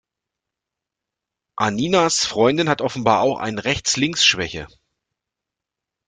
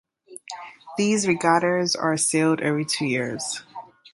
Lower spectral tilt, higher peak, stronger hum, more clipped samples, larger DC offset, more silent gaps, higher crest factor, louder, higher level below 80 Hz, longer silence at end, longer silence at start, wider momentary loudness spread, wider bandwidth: about the same, -3 dB/octave vs -3.5 dB/octave; about the same, -2 dBFS vs -4 dBFS; neither; neither; neither; neither; about the same, 20 dB vs 20 dB; first, -18 LUFS vs -22 LUFS; first, -52 dBFS vs -68 dBFS; first, 1.4 s vs 0.3 s; first, 1.55 s vs 0.3 s; second, 9 LU vs 18 LU; about the same, 11 kHz vs 11.5 kHz